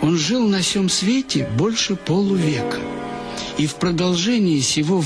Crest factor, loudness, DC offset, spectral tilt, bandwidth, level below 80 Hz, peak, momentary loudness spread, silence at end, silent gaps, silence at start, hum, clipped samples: 12 dB; -19 LUFS; under 0.1%; -4.5 dB/octave; 11 kHz; -48 dBFS; -8 dBFS; 9 LU; 0 s; none; 0 s; none; under 0.1%